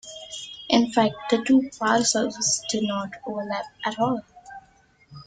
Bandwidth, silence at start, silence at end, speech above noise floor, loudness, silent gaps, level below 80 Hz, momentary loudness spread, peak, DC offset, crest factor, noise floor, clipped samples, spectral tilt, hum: 9.6 kHz; 0.05 s; 0.05 s; 35 dB; -23 LUFS; none; -64 dBFS; 15 LU; -6 dBFS; under 0.1%; 20 dB; -58 dBFS; under 0.1%; -3 dB/octave; none